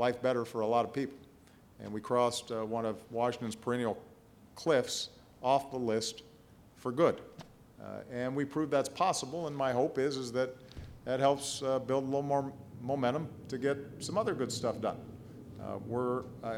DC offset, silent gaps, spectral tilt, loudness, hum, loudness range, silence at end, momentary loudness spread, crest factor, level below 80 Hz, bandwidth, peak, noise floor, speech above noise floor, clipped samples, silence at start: under 0.1%; none; -5 dB/octave; -34 LUFS; none; 3 LU; 0 s; 14 LU; 20 dB; -66 dBFS; 16.5 kHz; -14 dBFS; -59 dBFS; 26 dB; under 0.1%; 0 s